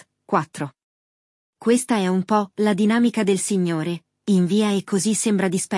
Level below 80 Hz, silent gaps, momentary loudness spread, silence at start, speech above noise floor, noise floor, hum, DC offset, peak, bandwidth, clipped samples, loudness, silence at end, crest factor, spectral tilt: -68 dBFS; 0.83-1.53 s; 9 LU; 0.3 s; over 70 dB; under -90 dBFS; none; under 0.1%; -6 dBFS; 12 kHz; under 0.1%; -21 LUFS; 0 s; 16 dB; -5 dB/octave